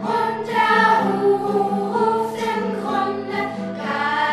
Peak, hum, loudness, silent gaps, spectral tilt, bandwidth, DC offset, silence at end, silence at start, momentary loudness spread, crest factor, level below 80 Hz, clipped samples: -4 dBFS; none; -20 LUFS; none; -5.5 dB/octave; 13 kHz; under 0.1%; 0 s; 0 s; 9 LU; 16 dB; -66 dBFS; under 0.1%